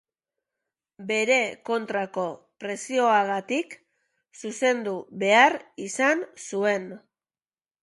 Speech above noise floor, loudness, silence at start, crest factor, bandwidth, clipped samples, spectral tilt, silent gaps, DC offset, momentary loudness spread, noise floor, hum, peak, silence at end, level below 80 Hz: over 65 dB; -24 LUFS; 1 s; 22 dB; 11.5 kHz; under 0.1%; -3 dB/octave; none; under 0.1%; 15 LU; under -90 dBFS; none; -4 dBFS; 0.85 s; -78 dBFS